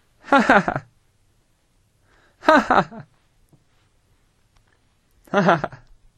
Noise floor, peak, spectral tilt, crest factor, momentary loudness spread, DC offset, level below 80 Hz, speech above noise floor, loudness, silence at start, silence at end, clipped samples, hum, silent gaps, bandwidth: -63 dBFS; 0 dBFS; -6 dB/octave; 22 dB; 17 LU; under 0.1%; -52 dBFS; 45 dB; -18 LUFS; 0.3 s; 0.45 s; under 0.1%; none; none; 13 kHz